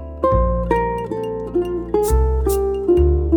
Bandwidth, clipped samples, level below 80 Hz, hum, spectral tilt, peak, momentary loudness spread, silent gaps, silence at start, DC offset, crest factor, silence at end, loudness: over 20 kHz; under 0.1%; -22 dBFS; none; -8 dB/octave; -4 dBFS; 7 LU; none; 0 s; under 0.1%; 14 dB; 0 s; -19 LUFS